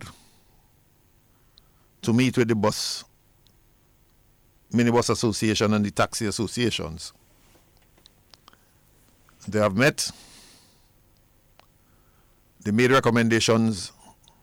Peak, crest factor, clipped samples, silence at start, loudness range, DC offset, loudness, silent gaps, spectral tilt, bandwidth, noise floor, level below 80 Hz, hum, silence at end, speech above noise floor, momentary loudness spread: -10 dBFS; 16 dB; under 0.1%; 0 s; 5 LU; under 0.1%; -23 LUFS; none; -4.5 dB/octave; 17.5 kHz; -60 dBFS; -56 dBFS; none; 0.55 s; 38 dB; 15 LU